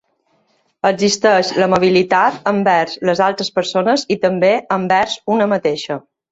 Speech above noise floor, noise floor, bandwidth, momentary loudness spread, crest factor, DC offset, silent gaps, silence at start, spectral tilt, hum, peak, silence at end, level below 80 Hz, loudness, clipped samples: 47 dB; -62 dBFS; 8 kHz; 6 LU; 14 dB; under 0.1%; none; 0.85 s; -4.5 dB/octave; none; 0 dBFS; 0.35 s; -56 dBFS; -15 LUFS; under 0.1%